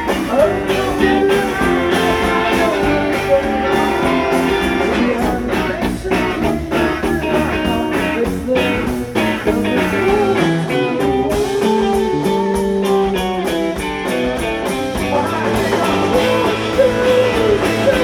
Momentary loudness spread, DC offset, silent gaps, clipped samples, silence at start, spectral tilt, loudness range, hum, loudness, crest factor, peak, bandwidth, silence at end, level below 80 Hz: 4 LU; under 0.1%; none; under 0.1%; 0 s; -5.5 dB/octave; 2 LU; none; -16 LUFS; 14 dB; -2 dBFS; 19.5 kHz; 0 s; -32 dBFS